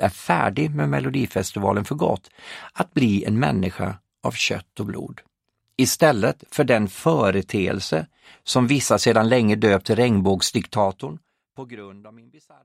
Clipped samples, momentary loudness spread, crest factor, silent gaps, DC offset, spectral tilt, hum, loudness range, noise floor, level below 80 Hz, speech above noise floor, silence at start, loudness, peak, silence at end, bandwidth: under 0.1%; 17 LU; 20 dB; none; under 0.1%; -5 dB/octave; none; 4 LU; -74 dBFS; -54 dBFS; 53 dB; 0 s; -21 LUFS; -2 dBFS; 0.55 s; 16 kHz